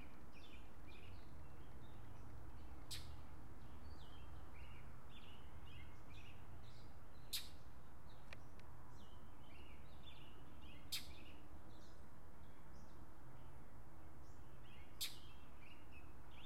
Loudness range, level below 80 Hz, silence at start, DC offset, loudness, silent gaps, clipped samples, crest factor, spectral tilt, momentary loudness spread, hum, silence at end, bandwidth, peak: 6 LU; -64 dBFS; 0 s; 0.5%; -58 LUFS; none; under 0.1%; 28 dB; -3.5 dB/octave; 14 LU; none; 0 s; 16 kHz; -28 dBFS